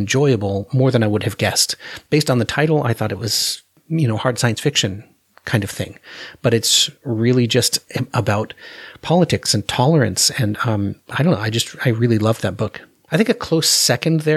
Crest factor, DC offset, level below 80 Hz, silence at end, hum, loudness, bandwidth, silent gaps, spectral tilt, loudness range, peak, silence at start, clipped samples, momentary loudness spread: 18 dB; under 0.1%; -52 dBFS; 0 s; none; -18 LUFS; 16 kHz; none; -4 dB/octave; 2 LU; 0 dBFS; 0 s; under 0.1%; 12 LU